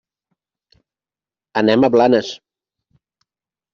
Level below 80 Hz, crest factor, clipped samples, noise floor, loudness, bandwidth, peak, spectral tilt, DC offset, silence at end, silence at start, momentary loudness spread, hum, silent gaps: -60 dBFS; 18 dB; under 0.1%; under -90 dBFS; -15 LUFS; 7.4 kHz; -2 dBFS; -6 dB/octave; under 0.1%; 1.35 s; 1.55 s; 17 LU; none; none